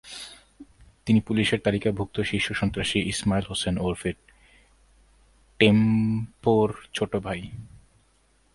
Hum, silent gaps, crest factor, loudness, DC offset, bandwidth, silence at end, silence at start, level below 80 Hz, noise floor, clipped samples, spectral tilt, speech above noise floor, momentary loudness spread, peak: none; none; 24 dB; -25 LUFS; under 0.1%; 11.5 kHz; 0.75 s; 0.05 s; -48 dBFS; -63 dBFS; under 0.1%; -5.5 dB/octave; 39 dB; 18 LU; -2 dBFS